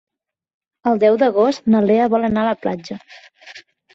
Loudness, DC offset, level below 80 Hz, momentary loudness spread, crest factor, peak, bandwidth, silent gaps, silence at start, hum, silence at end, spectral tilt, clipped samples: -17 LUFS; under 0.1%; -56 dBFS; 13 LU; 14 dB; -4 dBFS; 7.4 kHz; none; 0.85 s; none; 0.35 s; -7 dB/octave; under 0.1%